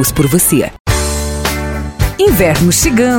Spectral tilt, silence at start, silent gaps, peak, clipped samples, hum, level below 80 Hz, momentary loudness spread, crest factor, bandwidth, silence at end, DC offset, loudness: -4.5 dB/octave; 0 s; 0.80-0.85 s; 0 dBFS; under 0.1%; none; -22 dBFS; 8 LU; 12 dB; 18 kHz; 0 s; under 0.1%; -12 LUFS